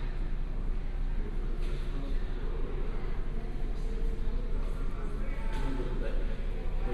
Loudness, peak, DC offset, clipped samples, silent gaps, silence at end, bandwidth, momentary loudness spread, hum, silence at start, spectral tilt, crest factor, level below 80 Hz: -38 LUFS; -20 dBFS; under 0.1%; under 0.1%; none; 0 s; 4.9 kHz; 3 LU; none; 0 s; -7.5 dB/octave; 10 dB; -30 dBFS